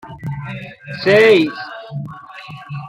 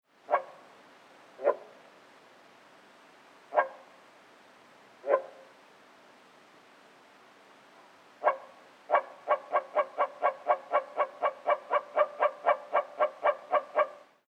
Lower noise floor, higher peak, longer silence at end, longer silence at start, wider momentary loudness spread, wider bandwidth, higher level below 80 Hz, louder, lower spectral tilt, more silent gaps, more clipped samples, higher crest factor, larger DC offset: second, -35 dBFS vs -58 dBFS; first, -2 dBFS vs -10 dBFS; second, 0 s vs 0.35 s; second, 0.05 s vs 0.3 s; first, 23 LU vs 5 LU; first, 13 kHz vs 8.8 kHz; first, -54 dBFS vs under -90 dBFS; first, -14 LUFS vs -31 LUFS; first, -6.5 dB/octave vs -3.5 dB/octave; neither; neither; second, 16 dB vs 24 dB; neither